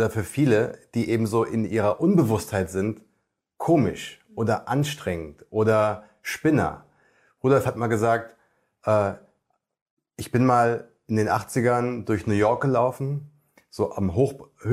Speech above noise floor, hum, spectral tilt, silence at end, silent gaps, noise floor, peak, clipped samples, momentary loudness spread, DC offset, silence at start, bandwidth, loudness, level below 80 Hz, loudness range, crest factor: 51 dB; none; -7 dB/octave; 0 s; 9.82-9.97 s; -74 dBFS; -6 dBFS; under 0.1%; 11 LU; under 0.1%; 0 s; 16 kHz; -24 LUFS; -58 dBFS; 3 LU; 18 dB